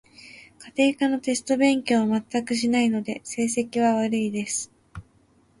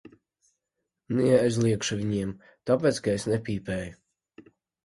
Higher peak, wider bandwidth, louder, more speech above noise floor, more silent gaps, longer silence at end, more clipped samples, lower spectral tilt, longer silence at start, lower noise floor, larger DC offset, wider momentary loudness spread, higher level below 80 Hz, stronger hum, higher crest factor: about the same, -8 dBFS vs -8 dBFS; about the same, 11.5 kHz vs 11.5 kHz; about the same, -24 LUFS vs -26 LUFS; second, 37 dB vs 58 dB; neither; second, 0.6 s vs 0.9 s; neither; second, -4 dB/octave vs -6 dB/octave; second, 0.25 s vs 1.1 s; second, -60 dBFS vs -84 dBFS; neither; about the same, 10 LU vs 12 LU; about the same, -60 dBFS vs -56 dBFS; neither; about the same, 16 dB vs 20 dB